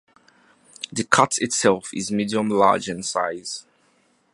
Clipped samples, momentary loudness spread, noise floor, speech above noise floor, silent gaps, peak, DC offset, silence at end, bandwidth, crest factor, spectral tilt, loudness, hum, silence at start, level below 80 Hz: under 0.1%; 13 LU; -63 dBFS; 41 dB; none; 0 dBFS; under 0.1%; 0.75 s; 11.5 kHz; 24 dB; -3.5 dB/octave; -21 LUFS; none; 0.8 s; -62 dBFS